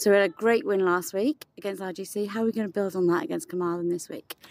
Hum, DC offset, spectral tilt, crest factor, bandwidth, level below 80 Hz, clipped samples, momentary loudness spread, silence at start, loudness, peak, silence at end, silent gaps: none; under 0.1%; -5 dB/octave; 16 dB; 16 kHz; -78 dBFS; under 0.1%; 11 LU; 0 s; -27 LUFS; -10 dBFS; 0.15 s; none